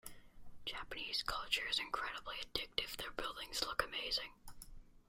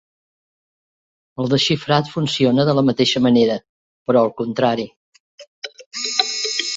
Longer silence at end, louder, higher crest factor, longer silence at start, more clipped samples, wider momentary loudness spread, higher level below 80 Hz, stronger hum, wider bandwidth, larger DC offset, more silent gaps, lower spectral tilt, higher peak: about the same, 0.1 s vs 0 s; second, -40 LUFS vs -18 LUFS; first, 26 dB vs 20 dB; second, 0.05 s vs 1.4 s; neither; about the same, 16 LU vs 16 LU; about the same, -60 dBFS vs -58 dBFS; neither; first, 16 kHz vs 8 kHz; neither; second, none vs 3.69-4.05 s, 4.96-5.13 s, 5.20-5.38 s, 5.47-5.62 s, 5.86-5.91 s; second, -1 dB/octave vs -4.5 dB/octave; second, -16 dBFS vs 0 dBFS